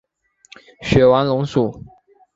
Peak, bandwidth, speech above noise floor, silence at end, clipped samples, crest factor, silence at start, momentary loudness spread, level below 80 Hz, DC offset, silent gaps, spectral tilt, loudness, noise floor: -2 dBFS; 7.8 kHz; 33 dB; 0.55 s; under 0.1%; 18 dB; 0.8 s; 11 LU; -40 dBFS; under 0.1%; none; -7 dB/octave; -16 LUFS; -50 dBFS